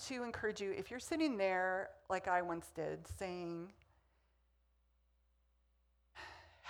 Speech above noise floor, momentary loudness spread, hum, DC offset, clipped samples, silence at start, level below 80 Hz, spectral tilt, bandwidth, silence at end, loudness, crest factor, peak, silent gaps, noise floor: 36 dB; 18 LU; none; under 0.1%; under 0.1%; 0 s; -68 dBFS; -4.5 dB/octave; 20 kHz; 0 s; -40 LUFS; 22 dB; -22 dBFS; none; -76 dBFS